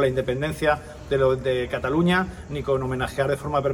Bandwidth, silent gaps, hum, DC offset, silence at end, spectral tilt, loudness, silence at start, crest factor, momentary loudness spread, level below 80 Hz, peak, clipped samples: 16.5 kHz; none; none; under 0.1%; 0 s; -6.5 dB/octave; -24 LUFS; 0 s; 16 dB; 6 LU; -42 dBFS; -6 dBFS; under 0.1%